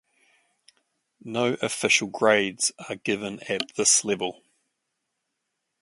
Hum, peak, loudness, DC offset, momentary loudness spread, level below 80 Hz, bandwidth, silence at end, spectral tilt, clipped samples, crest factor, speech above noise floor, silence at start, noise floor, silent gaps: none; -4 dBFS; -24 LUFS; under 0.1%; 11 LU; -70 dBFS; 11.5 kHz; 1.5 s; -2 dB/octave; under 0.1%; 24 dB; 55 dB; 1.25 s; -80 dBFS; none